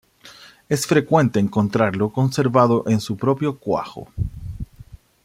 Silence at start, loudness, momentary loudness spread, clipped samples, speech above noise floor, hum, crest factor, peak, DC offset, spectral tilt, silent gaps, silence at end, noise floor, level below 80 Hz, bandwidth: 0.25 s; -20 LUFS; 16 LU; under 0.1%; 27 dB; none; 18 dB; -2 dBFS; under 0.1%; -6.5 dB/octave; none; 0.4 s; -46 dBFS; -42 dBFS; 16 kHz